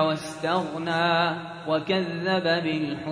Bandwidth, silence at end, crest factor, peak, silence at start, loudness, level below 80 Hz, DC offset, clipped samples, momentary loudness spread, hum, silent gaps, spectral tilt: 11 kHz; 0 s; 16 dB; -8 dBFS; 0 s; -25 LUFS; -64 dBFS; under 0.1%; under 0.1%; 6 LU; none; none; -5.5 dB/octave